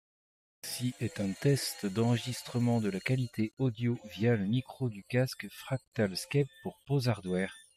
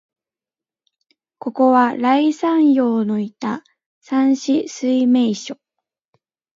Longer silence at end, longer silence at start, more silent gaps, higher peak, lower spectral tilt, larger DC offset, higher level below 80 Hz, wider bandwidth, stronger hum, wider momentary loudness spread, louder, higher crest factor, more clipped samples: second, 0.15 s vs 1.05 s; second, 0.65 s vs 1.45 s; second, 5.88-5.92 s vs 3.86-4.01 s; second, -16 dBFS vs -2 dBFS; about the same, -6 dB/octave vs -5.5 dB/octave; neither; first, -68 dBFS vs -74 dBFS; first, 15 kHz vs 7.6 kHz; neither; second, 8 LU vs 14 LU; second, -33 LUFS vs -17 LUFS; about the same, 16 dB vs 16 dB; neither